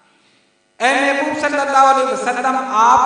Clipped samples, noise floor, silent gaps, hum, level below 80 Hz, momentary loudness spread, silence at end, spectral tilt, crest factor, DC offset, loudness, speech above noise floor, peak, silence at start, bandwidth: under 0.1%; -57 dBFS; none; none; -60 dBFS; 6 LU; 0 s; -2 dB/octave; 16 dB; under 0.1%; -15 LUFS; 44 dB; 0 dBFS; 0.8 s; 10.5 kHz